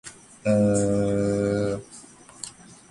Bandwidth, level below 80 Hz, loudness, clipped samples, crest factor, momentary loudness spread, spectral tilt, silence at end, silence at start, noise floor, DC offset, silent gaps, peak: 11.5 kHz; -50 dBFS; -24 LUFS; under 0.1%; 16 dB; 21 LU; -6.5 dB/octave; 0.4 s; 0.05 s; -47 dBFS; under 0.1%; none; -10 dBFS